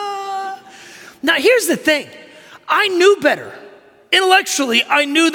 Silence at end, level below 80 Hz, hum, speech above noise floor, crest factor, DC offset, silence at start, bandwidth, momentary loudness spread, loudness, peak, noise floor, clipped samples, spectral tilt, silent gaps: 0 s; -66 dBFS; none; 28 dB; 16 dB; under 0.1%; 0 s; 17.5 kHz; 14 LU; -15 LUFS; -2 dBFS; -43 dBFS; under 0.1%; -1.5 dB/octave; none